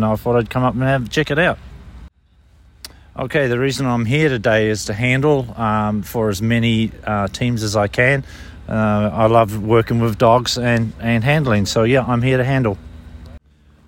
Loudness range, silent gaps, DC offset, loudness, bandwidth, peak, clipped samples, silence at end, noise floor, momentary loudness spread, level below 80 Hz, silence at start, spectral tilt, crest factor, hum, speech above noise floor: 5 LU; none; under 0.1%; -17 LUFS; 16.5 kHz; 0 dBFS; under 0.1%; 0.5 s; -52 dBFS; 6 LU; -40 dBFS; 0 s; -6 dB/octave; 16 dB; none; 35 dB